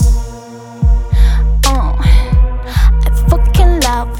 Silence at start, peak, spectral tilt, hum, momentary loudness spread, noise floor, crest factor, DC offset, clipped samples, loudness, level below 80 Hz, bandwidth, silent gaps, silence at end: 0 s; 0 dBFS; -5.5 dB/octave; none; 7 LU; -30 dBFS; 10 dB; under 0.1%; under 0.1%; -13 LUFS; -10 dBFS; 14 kHz; none; 0 s